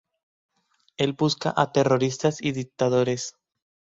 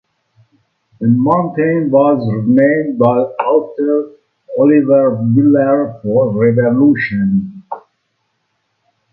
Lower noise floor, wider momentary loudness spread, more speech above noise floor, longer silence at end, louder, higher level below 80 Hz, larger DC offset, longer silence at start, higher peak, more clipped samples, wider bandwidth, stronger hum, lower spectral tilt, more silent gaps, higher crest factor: second, -58 dBFS vs -67 dBFS; about the same, 8 LU vs 8 LU; second, 35 dB vs 55 dB; second, 0.7 s vs 1.35 s; second, -24 LUFS vs -13 LUFS; second, -62 dBFS vs -54 dBFS; neither; about the same, 1 s vs 1 s; second, -4 dBFS vs 0 dBFS; neither; first, 8 kHz vs 4.5 kHz; neither; second, -5.5 dB/octave vs -12 dB/octave; neither; first, 22 dB vs 14 dB